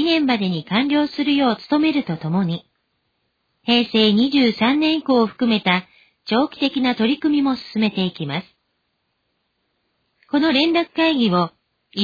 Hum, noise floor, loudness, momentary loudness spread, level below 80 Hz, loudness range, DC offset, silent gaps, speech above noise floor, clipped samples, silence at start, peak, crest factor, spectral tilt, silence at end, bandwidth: none; -71 dBFS; -19 LUFS; 8 LU; -58 dBFS; 5 LU; under 0.1%; none; 53 dB; under 0.1%; 0 s; -2 dBFS; 18 dB; -7 dB/octave; 0 s; 5 kHz